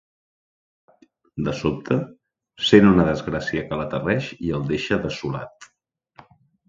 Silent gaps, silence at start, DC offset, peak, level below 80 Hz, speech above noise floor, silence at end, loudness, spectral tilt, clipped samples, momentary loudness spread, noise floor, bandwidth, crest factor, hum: none; 1.35 s; under 0.1%; 0 dBFS; -46 dBFS; 50 dB; 1.05 s; -22 LUFS; -6.5 dB/octave; under 0.1%; 15 LU; -71 dBFS; 7.6 kHz; 22 dB; none